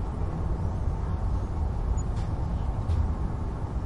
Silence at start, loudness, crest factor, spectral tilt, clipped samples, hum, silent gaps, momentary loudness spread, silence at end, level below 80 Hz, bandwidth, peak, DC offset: 0 s; -31 LUFS; 12 dB; -8 dB/octave; under 0.1%; none; none; 3 LU; 0 s; -30 dBFS; 10.5 kHz; -16 dBFS; under 0.1%